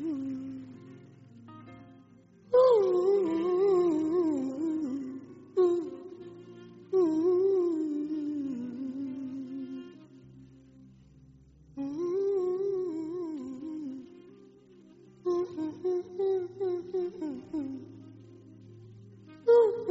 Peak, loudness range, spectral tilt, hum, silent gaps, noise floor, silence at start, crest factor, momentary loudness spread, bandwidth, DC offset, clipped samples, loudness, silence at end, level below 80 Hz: -12 dBFS; 10 LU; -7 dB/octave; none; none; -57 dBFS; 0 s; 18 dB; 24 LU; 7.6 kHz; under 0.1%; under 0.1%; -30 LUFS; 0 s; -72 dBFS